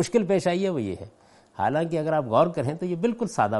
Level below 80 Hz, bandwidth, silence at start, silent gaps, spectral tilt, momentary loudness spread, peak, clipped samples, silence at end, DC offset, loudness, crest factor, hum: -62 dBFS; 11.5 kHz; 0 s; none; -6.5 dB/octave; 11 LU; -6 dBFS; under 0.1%; 0 s; under 0.1%; -25 LUFS; 18 dB; none